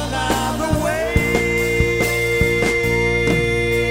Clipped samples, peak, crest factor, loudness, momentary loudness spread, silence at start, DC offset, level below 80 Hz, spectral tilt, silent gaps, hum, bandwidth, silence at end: under 0.1%; -2 dBFS; 16 dB; -18 LUFS; 3 LU; 0 s; under 0.1%; -28 dBFS; -5 dB/octave; none; none; 16.5 kHz; 0 s